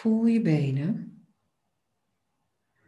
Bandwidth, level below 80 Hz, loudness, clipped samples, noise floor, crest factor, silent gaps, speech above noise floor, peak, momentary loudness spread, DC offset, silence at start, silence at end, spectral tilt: 8.4 kHz; -72 dBFS; -26 LUFS; under 0.1%; -79 dBFS; 16 dB; none; 55 dB; -12 dBFS; 12 LU; under 0.1%; 0 s; 1.75 s; -9 dB/octave